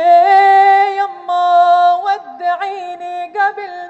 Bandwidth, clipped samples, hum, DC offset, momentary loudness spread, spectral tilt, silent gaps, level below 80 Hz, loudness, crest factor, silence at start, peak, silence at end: 8.2 kHz; under 0.1%; none; under 0.1%; 15 LU; -2 dB/octave; none; -78 dBFS; -12 LUFS; 12 dB; 0 s; -2 dBFS; 0 s